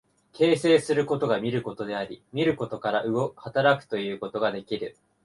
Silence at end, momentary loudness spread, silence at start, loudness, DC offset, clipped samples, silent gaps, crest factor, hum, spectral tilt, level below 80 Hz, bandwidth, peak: 0.35 s; 11 LU; 0.35 s; -26 LUFS; under 0.1%; under 0.1%; none; 20 dB; none; -6 dB/octave; -64 dBFS; 11.5 kHz; -6 dBFS